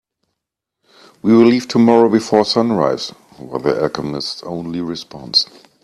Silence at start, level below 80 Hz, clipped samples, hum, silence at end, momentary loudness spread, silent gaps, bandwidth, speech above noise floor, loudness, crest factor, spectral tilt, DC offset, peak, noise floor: 1.25 s; -56 dBFS; under 0.1%; none; 0.4 s; 14 LU; none; 11.5 kHz; 64 dB; -16 LUFS; 16 dB; -5.5 dB/octave; under 0.1%; 0 dBFS; -79 dBFS